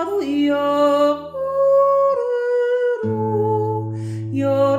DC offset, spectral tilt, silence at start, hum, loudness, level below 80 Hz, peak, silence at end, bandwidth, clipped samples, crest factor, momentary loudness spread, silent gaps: under 0.1%; -7.5 dB/octave; 0 s; none; -19 LUFS; -60 dBFS; -6 dBFS; 0 s; 14 kHz; under 0.1%; 12 dB; 9 LU; none